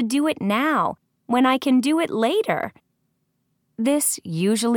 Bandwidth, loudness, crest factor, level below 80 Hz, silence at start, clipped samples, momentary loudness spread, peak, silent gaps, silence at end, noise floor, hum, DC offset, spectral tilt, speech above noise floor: 19 kHz; -21 LUFS; 16 dB; -70 dBFS; 0 s; under 0.1%; 7 LU; -4 dBFS; none; 0 s; -71 dBFS; none; under 0.1%; -4 dB/octave; 51 dB